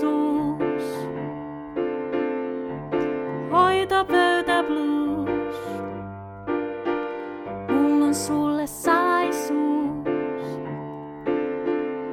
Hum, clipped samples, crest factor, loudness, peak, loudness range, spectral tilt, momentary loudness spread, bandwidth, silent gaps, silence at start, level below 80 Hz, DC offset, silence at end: none; under 0.1%; 18 dB; -24 LUFS; -6 dBFS; 4 LU; -5 dB/octave; 13 LU; 15.5 kHz; none; 0 s; -56 dBFS; under 0.1%; 0 s